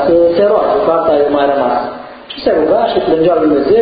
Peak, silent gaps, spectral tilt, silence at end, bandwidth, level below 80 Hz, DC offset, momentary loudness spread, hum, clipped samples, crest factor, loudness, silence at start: 0 dBFS; none; -10 dB/octave; 0 s; 5 kHz; -42 dBFS; under 0.1%; 8 LU; none; under 0.1%; 10 dB; -12 LUFS; 0 s